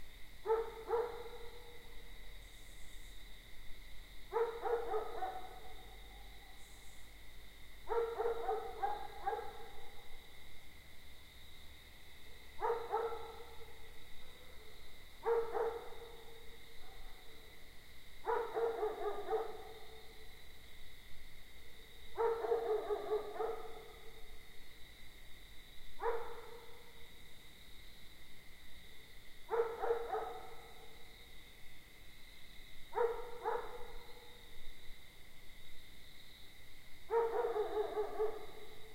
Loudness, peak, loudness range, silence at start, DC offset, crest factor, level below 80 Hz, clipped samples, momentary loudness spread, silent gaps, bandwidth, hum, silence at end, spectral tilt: -41 LUFS; -22 dBFS; 8 LU; 0 s; under 0.1%; 18 dB; -56 dBFS; under 0.1%; 20 LU; none; 16 kHz; none; 0 s; -4 dB/octave